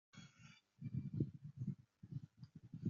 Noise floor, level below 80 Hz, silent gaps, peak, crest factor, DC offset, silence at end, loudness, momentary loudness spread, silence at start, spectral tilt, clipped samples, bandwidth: -66 dBFS; -78 dBFS; none; -26 dBFS; 24 dB; under 0.1%; 0 s; -49 LUFS; 17 LU; 0.15 s; -9.5 dB/octave; under 0.1%; 7.2 kHz